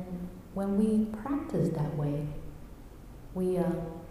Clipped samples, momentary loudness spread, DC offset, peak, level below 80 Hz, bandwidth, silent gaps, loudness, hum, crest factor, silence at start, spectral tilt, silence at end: under 0.1%; 22 LU; under 0.1%; -16 dBFS; -48 dBFS; 15.5 kHz; none; -32 LUFS; none; 16 dB; 0 s; -9 dB/octave; 0 s